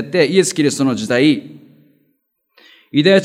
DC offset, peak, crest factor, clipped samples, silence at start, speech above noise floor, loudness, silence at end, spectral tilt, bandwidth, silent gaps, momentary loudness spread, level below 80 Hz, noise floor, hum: under 0.1%; 0 dBFS; 16 dB; under 0.1%; 0 s; 52 dB; -15 LUFS; 0 s; -4.5 dB/octave; 14.5 kHz; none; 6 LU; -68 dBFS; -66 dBFS; none